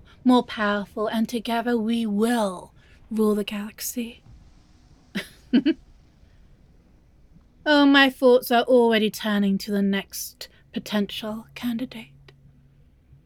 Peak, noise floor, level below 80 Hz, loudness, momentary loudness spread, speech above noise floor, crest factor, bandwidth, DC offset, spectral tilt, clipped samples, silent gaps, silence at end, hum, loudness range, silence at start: -2 dBFS; -55 dBFS; -56 dBFS; -23 LUFS; 17 LU; 33 dB; 22 dB; 19 kHz; under 0.1%; -4.5 dB/octave; under 0.1%; none; 1.2 s; none; 11 LU; 0.25 s